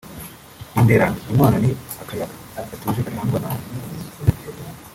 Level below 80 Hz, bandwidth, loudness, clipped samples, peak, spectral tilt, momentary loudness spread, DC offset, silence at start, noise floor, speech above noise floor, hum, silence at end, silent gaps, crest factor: -42 dBFS; 17 kHz; -21 LUFS; under 0.1%; -2 dBFS; -7 dB/octave; 19 LU; under 0.1%; 0.05 s; -40 dBFS; 19 dB; none; 0 s; none; 18 dB